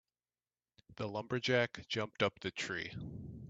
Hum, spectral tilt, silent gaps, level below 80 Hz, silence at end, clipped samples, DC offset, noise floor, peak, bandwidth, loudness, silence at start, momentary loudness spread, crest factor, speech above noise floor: none; -4.5 dB/octave; none; -66 dBFS; 0 s; under 0.1%; under 0.1%; under -90 dBFS; -16 dBFS; 8.4 kHz; -38 LUFS; 0.9 s; 12 LU; 22 dB; over 52 dB